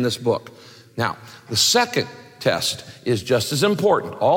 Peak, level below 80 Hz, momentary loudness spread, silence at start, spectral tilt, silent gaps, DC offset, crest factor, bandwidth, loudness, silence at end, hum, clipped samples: -6 dBFS; -60 dBFS; 11 LU; 0 s; -3.5 dB/octave; none; under 0.1%; 16 dB; 17 kHz; -21 LUFS; 0 s; none; under 0.1%